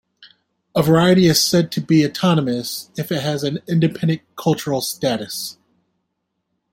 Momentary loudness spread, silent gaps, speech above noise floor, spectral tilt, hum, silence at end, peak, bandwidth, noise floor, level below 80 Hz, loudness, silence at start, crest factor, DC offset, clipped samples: 11 LU; none; 57 dB; -5 dB/octave; none; 1.2 s; -2 dBFS; 16.5 kHz; -74 dBFS; -54 dBFS; -18 LUFS; 0.2 s; 18 dB; under 0.1%; under 0.1%